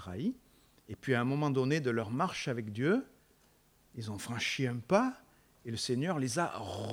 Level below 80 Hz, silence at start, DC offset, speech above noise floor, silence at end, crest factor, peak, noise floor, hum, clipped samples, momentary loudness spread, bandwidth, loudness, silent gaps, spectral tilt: -70 dBFS; 0 s; under 0.1%; 34 dB; 0 s; 20 dB; -14 dBFS; -67 dBFS; none; under 0.1%; 16 LU; 18.5 kHz; -34 LUFS; none; -5.5 dB/octave